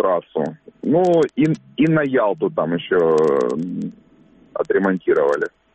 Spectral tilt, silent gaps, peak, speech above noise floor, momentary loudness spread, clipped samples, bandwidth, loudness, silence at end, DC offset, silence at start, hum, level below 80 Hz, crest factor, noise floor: -7.5 dB/octave; none; -6 dBFS; 33 dB; 11 LU; under 0.1%; 8.4 kHz; -19 LUFS; 0.25 s; under 0.1%; 0 s; none; -58 dBFS; 12 dB; -51 dBFS